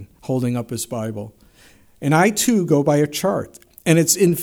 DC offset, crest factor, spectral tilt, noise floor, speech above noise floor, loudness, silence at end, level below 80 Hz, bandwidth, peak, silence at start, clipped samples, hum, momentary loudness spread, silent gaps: under 0.1%; 18 dB; -5 dB/octave; -51 dBFS; 32 dB; -19 LUFS; 0 s; -56 dBFS; 19 kHz; -2 dBFS; 0 s; under 0.1%; none; 13 LU; none